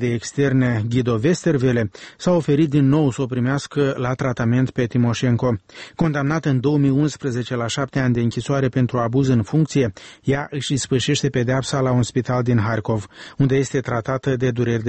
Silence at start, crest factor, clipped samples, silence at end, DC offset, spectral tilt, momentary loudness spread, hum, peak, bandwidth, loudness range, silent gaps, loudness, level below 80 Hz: 0 s; 14 dB; under 0.1%; 0 s; under 0.1%; -6.5 dB/octave; 6 LU; none; -6 dBFS; 8.8 kHz; 2 LU; none; -20 LUFS; -48 dBFS